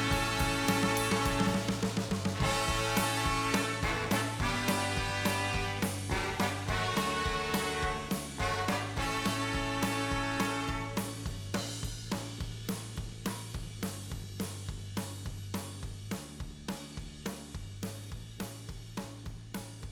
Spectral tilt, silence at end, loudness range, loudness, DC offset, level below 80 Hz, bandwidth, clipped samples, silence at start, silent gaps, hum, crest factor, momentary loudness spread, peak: -4 dB/octave; 0 s; 11 LU; -33 LUFS; under 0.1%; -46 dBFS; over 20 kHz; under 0.1%; 0 s; none; none; 20 dB; 13 LU; -14 dBFS